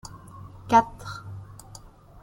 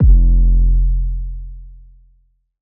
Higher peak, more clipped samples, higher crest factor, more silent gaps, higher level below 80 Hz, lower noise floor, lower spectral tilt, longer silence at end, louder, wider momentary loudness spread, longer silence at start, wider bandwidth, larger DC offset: second, -6 dBFS vs -2 dBFS; neither; first, 22 dB vs 12 dB; neither; second, -52 dBFS vs -14 dBFS; second, -48 dBFS vs -57 dBFS; second, -5.5 dB/octave vs -16 dB/octave; second, 0.05 s vs 0.9 s; second, -22 LUFS vs -17 LUFS; first, 25 LU vs 19 LU; about the same, 0.05 s vs 0 s; first, 16.5 kHz vs 0.6 kHz; neither